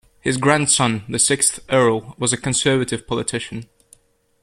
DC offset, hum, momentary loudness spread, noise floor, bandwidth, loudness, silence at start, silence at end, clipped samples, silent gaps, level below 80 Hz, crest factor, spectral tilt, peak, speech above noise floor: under 0.1%; none; 9 LU; -54 dBFS; 15 kHz; -18 LUFS; 0.25 s; 0.8 s; under 0.1%; none; -52 dBFS; 18 dB; -3 dB/octave; -2 dBFS; 35 dB